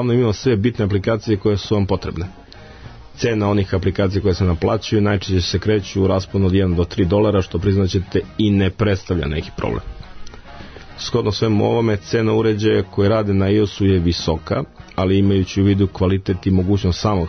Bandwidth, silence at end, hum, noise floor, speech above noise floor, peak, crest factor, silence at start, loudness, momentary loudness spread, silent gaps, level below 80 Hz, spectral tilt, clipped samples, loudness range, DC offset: 6.6 kHz; 0 s; none; -38 dBFS; 21 dB; -6 dBFS; 12 dB; 0 s; -18 LUFS; 8 LU; none; -36 dBFS; -7 dB/octave; under 0.1%; 4 LU; under 0.1%